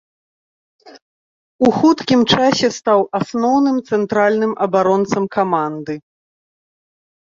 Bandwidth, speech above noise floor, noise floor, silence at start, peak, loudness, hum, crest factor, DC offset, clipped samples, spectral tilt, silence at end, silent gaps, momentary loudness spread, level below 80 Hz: 7.8 kHz; over 75 dB; under -90 dBFS; 0.85 s; 0 dBFS; -16 LUFS; none; 16 dB; under 0.1%; under 0.1%; -5 dB/octave; 1.4 s; 1.02-1.59 s; 7 LU; -54 dBFS